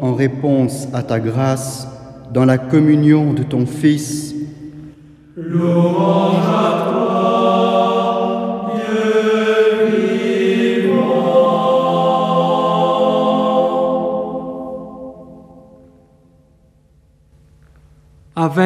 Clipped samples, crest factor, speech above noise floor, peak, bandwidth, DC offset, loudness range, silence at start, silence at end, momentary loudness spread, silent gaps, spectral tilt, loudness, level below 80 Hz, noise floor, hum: under 0.1%; 14 dB; 37 dB; 0 dBFS; 14.5 kHz; under 0.1%; 7 LU; 0 s; 0 s; 14 LU; none; -7 dB/octave; -15 LUFS; -54 dBFS; -52 dBFS; none